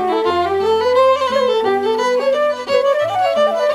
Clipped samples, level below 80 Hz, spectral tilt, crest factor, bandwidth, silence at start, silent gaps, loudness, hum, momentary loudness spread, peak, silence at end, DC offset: under 0.1%; -56 dBFS; -4 dB/octave; 12 dB; 13.5 kHz; 0 s; none; -16 LUFS; none; 3 LU; -4 dBFS; 0 s; under 0.1%